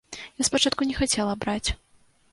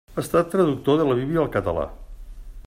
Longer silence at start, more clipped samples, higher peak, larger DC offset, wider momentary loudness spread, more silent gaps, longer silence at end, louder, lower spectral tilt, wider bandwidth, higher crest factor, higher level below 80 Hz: about the same, 0.1 s vs 0.1 s; neither; about the same, -6 dBFS vs -6 dBFS; neither; first, 11 LU vs 7 LU; neither; first, 0.55 s vs 0.05 s; second, -25 LUFS vs -22 LUFS; second, -2.5 dB/octave vs -7 dB/octave; second, 12 kHz vs 16 kHz; about the same, 20 dB vs 16 dB; about the same, -42 dBFS vs -42 dBFS